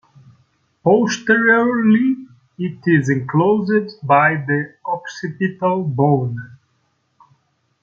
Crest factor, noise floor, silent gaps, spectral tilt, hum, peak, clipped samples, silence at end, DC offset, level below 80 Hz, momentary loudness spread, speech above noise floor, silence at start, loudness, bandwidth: 18 dB; -65 dBFS; none; -7 dB/octave; none; 0 dBFS; under 0.1%; 1.25 s; under 0.1%; -62 dBFS; 12 LU; 49 dB; 0.85 s; -17 LUFS; 7.2 kHz